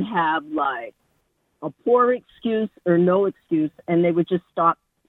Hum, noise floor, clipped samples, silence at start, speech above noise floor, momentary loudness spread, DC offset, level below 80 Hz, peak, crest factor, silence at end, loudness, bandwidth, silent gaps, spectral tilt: none; -69 dBFS; under 0.1%; 0 s; 48 dB; 10 LU; under 0.1%; -66 dBFS; -6 dBFS; 16 dB; 0.35 s; -21 LUFS; 4 kHz; none; -9.5 dB/octave